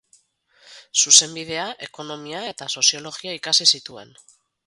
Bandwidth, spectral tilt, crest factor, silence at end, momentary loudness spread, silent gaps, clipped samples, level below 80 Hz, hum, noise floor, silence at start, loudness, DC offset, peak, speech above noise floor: 16 kHz; 0.5 dB/octave; 24 dB; 0.6 s; 20 LU; none; under 0.1%; -70 dBFS; none; -60 dBFS; 0.7 s; -17 LUFS; under 0.1%; 0 dBFS; 38 dB